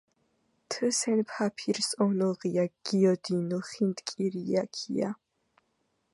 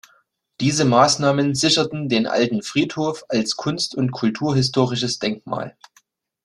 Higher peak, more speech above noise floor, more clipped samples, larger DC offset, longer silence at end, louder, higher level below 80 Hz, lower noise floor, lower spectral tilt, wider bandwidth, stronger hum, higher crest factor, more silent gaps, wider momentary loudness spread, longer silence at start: second, -12 dBFS vs -2 dBFS; first, 47 dB vs 41 dB; neither; neither; first, 1 s vs 0.75 s; second, -29 LUFS vs -20 LUFS; second, -78 dBFS vs -56 dBFS; first, -76 dBFS vs -61 dBFS; about the same, -5 dB/octave vs -4.5 dB/octave; about the same, 11.5 kHz vs 12.5 kHz; neither; about the same, 18 dB vs 18 dB; neither; about the same, 7 LU vs 9 LU; about the same, 0.7 s vs 0.6 s